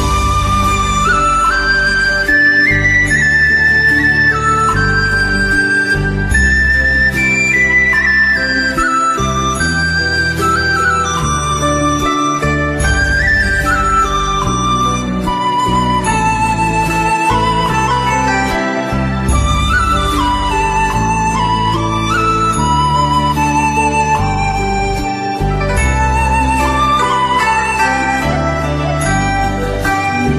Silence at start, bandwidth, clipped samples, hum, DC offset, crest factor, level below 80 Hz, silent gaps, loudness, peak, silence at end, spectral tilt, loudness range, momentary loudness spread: 0 s; 15 kHz; under 0.1%; none; under 0.1%; 12 dB; -22 dBFS; none; -12 LUFS; -2 dBFS; 0 s; -4 dB/octave; 4 LU; 6 LU